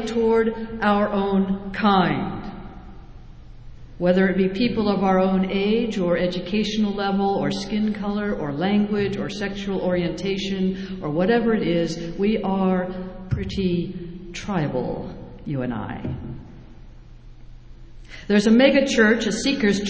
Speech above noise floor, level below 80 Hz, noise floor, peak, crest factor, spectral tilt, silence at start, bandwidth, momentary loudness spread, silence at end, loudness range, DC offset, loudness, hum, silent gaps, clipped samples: 21 dB; -42 dBFS; -42 dBFS; -4 dBFS; 18 dB; -6 dB/octave; 0 s; 8 kHz; 13 LU; 0 s; 8 LU; under 0.1%; -22 LUFS; none; none; under 0.1%